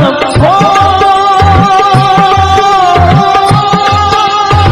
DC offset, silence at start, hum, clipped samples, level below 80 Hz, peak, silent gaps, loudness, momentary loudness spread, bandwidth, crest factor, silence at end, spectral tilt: under 0.1%; 0 s; none; under 0.1%; -24 dBFS; 0 dBFS; none; -6 LUFS; 2 LU; 13 kHz; 6 dB; 0 s; -5.5 dB/octave